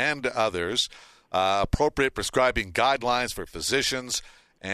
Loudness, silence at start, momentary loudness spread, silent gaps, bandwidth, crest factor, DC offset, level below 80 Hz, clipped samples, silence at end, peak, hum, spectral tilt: -25 LUFS; 0 s; 7 LU; none; 14 kHz; 18 dB; under 0.1%; -44 dBFS; under 0.1%; 0 s; -8 dBFS; none; -3 dB/octave